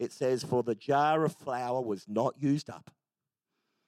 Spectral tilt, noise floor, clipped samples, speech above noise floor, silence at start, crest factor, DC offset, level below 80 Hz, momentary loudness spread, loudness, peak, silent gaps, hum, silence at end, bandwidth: -6.5 dB/octave; under -90 dBFS; under 0.1%; over 60 dB; 0 s; 16 dB; under 0.1%; -78 dBFS; 7 LU; -31 LUFS; -16 dBFS; none; none; 1.1 s; 14 kHz